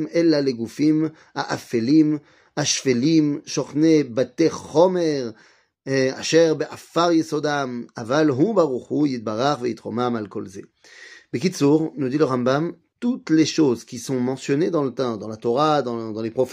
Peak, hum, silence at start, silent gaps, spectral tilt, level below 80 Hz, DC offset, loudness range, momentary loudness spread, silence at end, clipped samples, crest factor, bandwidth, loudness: -2 dBFS; none; 0 s; none; -5.5 dB/octave; -66 dBFS; under 0.1%; 3 LU; 10 LU; 0 s; under 0.1%; 18 dB; 12 kHz; -21 LUFS